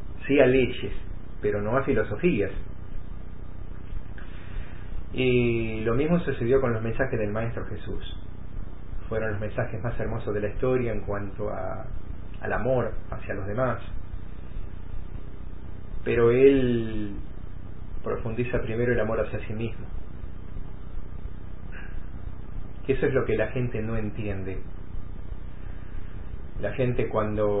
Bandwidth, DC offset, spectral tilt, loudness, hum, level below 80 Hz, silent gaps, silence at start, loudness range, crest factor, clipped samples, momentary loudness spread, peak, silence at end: 4 kHz; 2%; -11.5 dB/octave; -27 LUFS; none; -38 dBFS; none; 0 s; 7 LU; 22 dB; under 0.1%; 18 LU; -6 dBFS; 0 s